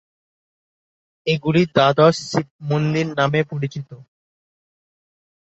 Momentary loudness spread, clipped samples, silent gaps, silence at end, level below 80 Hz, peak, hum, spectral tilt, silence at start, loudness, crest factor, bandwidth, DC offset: 13 LU; under 0.1%; 2.51-2.59 s; 1.4 s; -58 dBFS; -2 dBFS; none; -6 dB/octave; 1.25 s; -19 LUFS; 20 dB; 8 kHz; under 0.1%